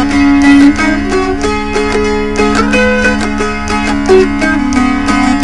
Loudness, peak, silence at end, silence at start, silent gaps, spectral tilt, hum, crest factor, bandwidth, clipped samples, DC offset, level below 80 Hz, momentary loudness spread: -10 LUFS; 0 dBFS; 0 s; 0 s; none; -5 dB/octave; none; 10 dB; 11.5 kHz; 0.5%; under 0.1%; -22 dBFS; 7 LU